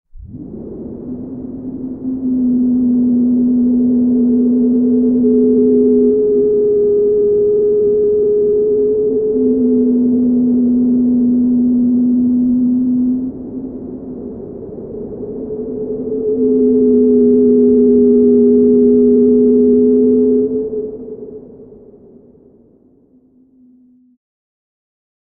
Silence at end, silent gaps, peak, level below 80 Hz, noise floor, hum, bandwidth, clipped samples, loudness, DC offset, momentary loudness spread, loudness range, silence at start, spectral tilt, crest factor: 3.6 s; none; -2 dBFS; -44 dBFS; -50 dBFS; none; 1.3 kHz; under 0.1%; -12 LUFS; under 0.1%; 17 LU; 9 LU; 0.15 s; -15 dB/octave; 12 dB